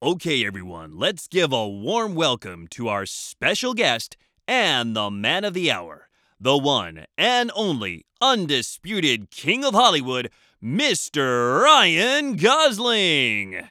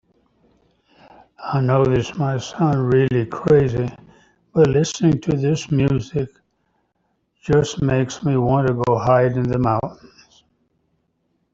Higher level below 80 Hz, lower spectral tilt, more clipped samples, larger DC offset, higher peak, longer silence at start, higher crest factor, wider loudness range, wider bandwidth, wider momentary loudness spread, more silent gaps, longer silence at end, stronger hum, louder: second, -64 dBFS vs -46 dBFS; second, -3 dB/octave vs -7 dB/octave; neither; neither; about the same, -2 dBFS vs -2 dBFS; second, 0 s vs 1.4 s; about the same, 20 dB vs 18 dB; first, 6 LU vs 3 LU; first, 18.5 kHz vs 7.8 kHz; about the same, 11 LU vs 9 LU; neither; second, 0.05 s vs 1.6 s; neither; about the same, -20 LUFS vs -19 LUFS